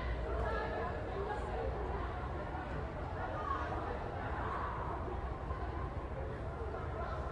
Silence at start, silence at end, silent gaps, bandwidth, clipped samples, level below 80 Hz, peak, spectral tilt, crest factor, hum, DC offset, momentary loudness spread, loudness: 0 s; 0 s; none; 9.4 kHz; under 0.1%; -44 dBFS; -26 dBFS; -7.5 dB/octave; 14 dB; none; under 0.1%; 4 LU; -40 LUFS